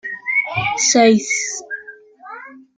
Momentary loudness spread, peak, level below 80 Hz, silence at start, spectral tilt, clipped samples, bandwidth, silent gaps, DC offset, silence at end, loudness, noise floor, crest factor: 23 LU; -2 dBFS; -60 dBFS; 0.05 s; -2.5 dB/octave; under 0.1%; 9.6 kHz; none; under 0.1%; 0.2 s; -16 LUFS; -40 dBFS; 18 dB